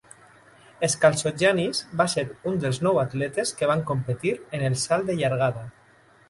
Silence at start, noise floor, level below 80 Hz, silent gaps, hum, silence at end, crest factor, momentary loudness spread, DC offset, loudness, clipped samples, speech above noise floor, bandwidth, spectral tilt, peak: 0.8 s; -53 dBFS; -58 dBFS; none; none; 0.6 s; 20 dB; 7 LU; under 0.1%; -24 LUFS; under 0.1%; 29 dB; 11.5 kHz; -4.5 dB/octave; -4 dBFS